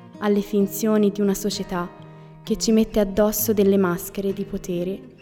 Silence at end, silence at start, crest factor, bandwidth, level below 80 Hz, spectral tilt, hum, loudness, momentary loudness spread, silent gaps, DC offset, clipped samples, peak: 0.1 s; 0 s; 14 dB; 18.5 kHz; -44 dBFS; -5.5 dB/octave; none; -22 LUFS; 10 LU; none; under 0.1%; under 0.1%; -6 dBFS